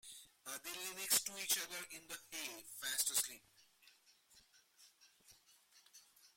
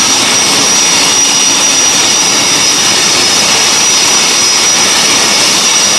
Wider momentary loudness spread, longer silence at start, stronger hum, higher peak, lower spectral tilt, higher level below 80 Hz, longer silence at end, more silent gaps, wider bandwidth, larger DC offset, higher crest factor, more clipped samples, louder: first, 19 LU vs 1 LU; about the same, 0.05 s vs 0 s; neither; second, -20 dBFS vs 0 dBFS; about the same, 1.5 dB/octave vs 0.5 dB/octave; second, -84 dBFS vs -46 dBFS; about the same, 0.1 s vs 0 s; neither; first, 16.5 kHz vs 12 kHz; neither; first, 26 dB vs 8 dB; second, under 0.1% vs 1%; second, -40 LUFS vs -5 LUFS